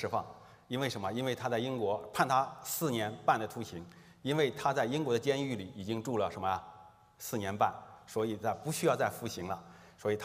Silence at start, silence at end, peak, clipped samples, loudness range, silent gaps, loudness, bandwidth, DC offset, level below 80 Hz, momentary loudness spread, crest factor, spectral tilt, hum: 0 s; 0 s; -10 dBFS; under 0.1%; 2 LU; none; -34 LUFS; 16 kHz; under 0.1%; -72 dBFS; 11 LU; 24 dB; -5 dB/octave; none